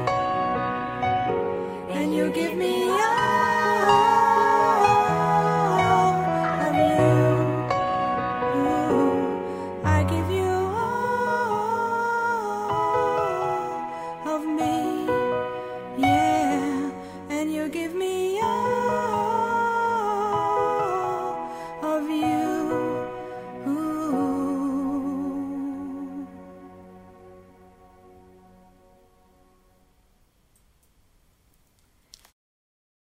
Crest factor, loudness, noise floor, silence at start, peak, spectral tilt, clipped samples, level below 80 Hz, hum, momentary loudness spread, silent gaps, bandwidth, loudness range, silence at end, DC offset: 18 dB; -24 LUFS; -63 dBFS; 0 s; -6 dBFS; -6 dB/octave; under 0.1%; -54 dBFS; none; 12 LU; none; 16 kHz; 9 LU; 5.75 s; under 0.1%